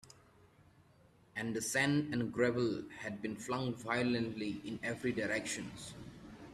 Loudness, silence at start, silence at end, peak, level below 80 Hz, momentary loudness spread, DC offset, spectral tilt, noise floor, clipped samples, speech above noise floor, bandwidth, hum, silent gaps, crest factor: -37 LUFS; 0.05 s; 0 s; -18 dBFS; -68 dBFS; 14 LU; under 0.1%; -4.5 dB/octave; -66 dBFS; under 0.1%; 29 dB; 14 kHz; none; none; 20 dB